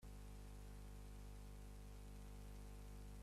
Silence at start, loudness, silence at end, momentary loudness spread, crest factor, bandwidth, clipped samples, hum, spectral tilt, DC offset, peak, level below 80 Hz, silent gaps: 0 s; -59 LUFS; 0 s; 1 LU; 10 dB; 15 kHz; under 0.1%; 50 Hz at -55 dBFS; -5.5 dB/octave; under 0.1%; -46 dBFS; -56 dBFS; none